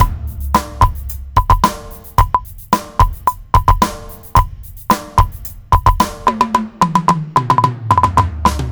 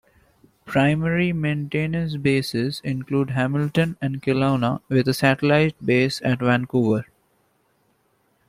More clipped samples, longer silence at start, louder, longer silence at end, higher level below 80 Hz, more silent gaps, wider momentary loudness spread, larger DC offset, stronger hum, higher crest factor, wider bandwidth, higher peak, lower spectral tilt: first, 0.4% vs under 0.1%; second, 0 s vs 0.65 s; first, -15 LUFS vs -22 LUFS; second, 0 s vs 1.45 s; first, -22 dBFS vs -54 dBFS; neither; about the same, 7 LU vs 6 LU; first, 0.4% vs under 0.1%; neither; second, 14 dB vs 20 dB; first, over 20 kHz vs 15.5 kHz; about the same, 0 dBFS vs -2 dBFS; second, -5.5 dB/octave vs -7 dB/octave